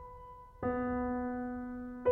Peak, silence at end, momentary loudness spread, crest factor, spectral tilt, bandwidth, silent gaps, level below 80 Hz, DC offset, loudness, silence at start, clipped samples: -20 dBFS; 0 s; 16 LU; 18 dB; -10 dB/octave; 3.2 kHz; none; -54 dBFS; under 0.1%; -37 LUFS; 0 s; under 0.1%